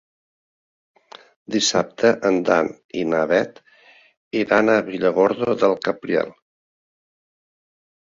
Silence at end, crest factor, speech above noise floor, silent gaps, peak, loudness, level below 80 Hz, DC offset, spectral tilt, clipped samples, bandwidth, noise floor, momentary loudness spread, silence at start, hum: 1.8 s; 20 dB; 33 dB; 2.84-2.89 s, 4.17-4.31 s; -2 dBFS; -20 LUFS; -62 dBFS; under 0.1%; -4 dB/octave; under 0.1%; 7.6 kHz; -52 dBFS; 9 LU; 1.5 s; none